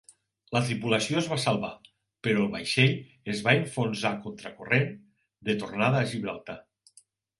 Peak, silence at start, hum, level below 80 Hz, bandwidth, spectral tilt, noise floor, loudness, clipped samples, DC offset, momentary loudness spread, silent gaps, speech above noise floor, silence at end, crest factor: -6 dBFS; 0.5 s; none; -64 dBFS; 11.5 kHz; -5 dB/octave; -62 dBFS; -27 LUFS; under 0.1%; under 0.1%; 13 LU; none; 34 dB; 0.8 s; 24 dB